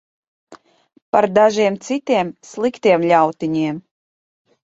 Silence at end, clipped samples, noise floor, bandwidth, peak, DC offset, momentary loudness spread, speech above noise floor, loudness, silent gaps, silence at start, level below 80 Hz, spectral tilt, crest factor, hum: 0.95 s; under 0.1%; under -90 dBFS; 8 kHz; -2 dBFS; under 0.1%; 10 LU; over 74 dB; -17 LUFS; 1.02-1.13 s; 0.5 s; -62 dBFS; -5.5 dB/octave; 18 dB; none